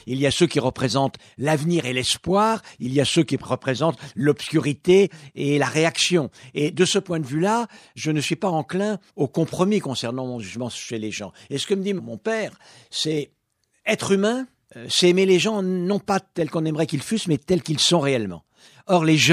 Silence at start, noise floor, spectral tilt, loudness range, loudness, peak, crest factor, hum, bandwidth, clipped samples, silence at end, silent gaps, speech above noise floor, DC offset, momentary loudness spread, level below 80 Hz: 0.05 s; -70 dBFS; -4.5 dB/octave; 5 LU; -22 LUFS; -4 dBFS; 18 dB; none; 14.5 kHz; under 0.1%; 0 s; none; 48 dB; under 0.1%; 12 LU; -58 dBFS